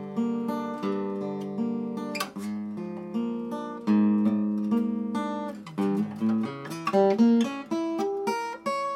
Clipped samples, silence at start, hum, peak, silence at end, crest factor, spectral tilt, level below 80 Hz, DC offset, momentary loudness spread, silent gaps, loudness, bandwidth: under 0.1%; 0 s; none; -10 dBFS; 0 s; 16 dB; -7 dB/octave; -76 dBFS; under 0.1%; 11 LU; none; -28 LUFS; 14 kHz